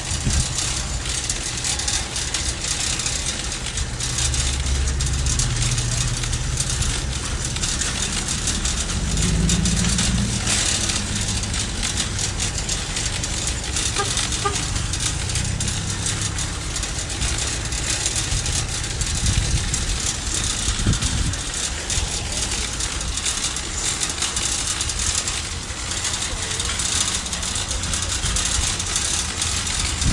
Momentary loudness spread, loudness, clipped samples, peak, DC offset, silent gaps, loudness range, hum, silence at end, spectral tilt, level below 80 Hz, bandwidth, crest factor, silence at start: 4 LU; -22 LUFS; under 0.1%; -4 dBFS; under 0.1%; none; 2 LU; none; 0 s; -2 dB/octave; -28 dBFS; 11.5 kHz; 18 dB; 0 s